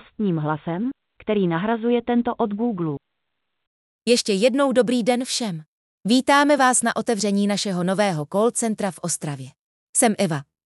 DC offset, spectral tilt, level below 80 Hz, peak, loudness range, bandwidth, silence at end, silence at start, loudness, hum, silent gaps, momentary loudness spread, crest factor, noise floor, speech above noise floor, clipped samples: under 0.1%; -4 dB/octave; -62 dBFS; -6 dBFS; 4 LU; 12 kHz; 0.25 s; 0.2 s; -21 LUFS; none; 3.67-3.99 s, 5.67-6.01 s, 9.59-9.93 s; 12 LU; 16 dB; -79 dBFS; 58 dB; under 0.1%